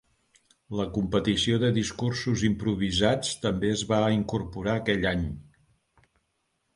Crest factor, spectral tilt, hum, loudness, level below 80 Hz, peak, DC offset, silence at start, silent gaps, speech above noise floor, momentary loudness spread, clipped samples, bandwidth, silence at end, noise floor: 20 dB; -5 dB/octave; none; -27 LUFS; -46 dBFS; -8 dBFS; under 0.1%; 0.7 s; none; 50 dB; 7 LU; under 0.1%; 11.5 kHz; 1.35 s; -76 dBFS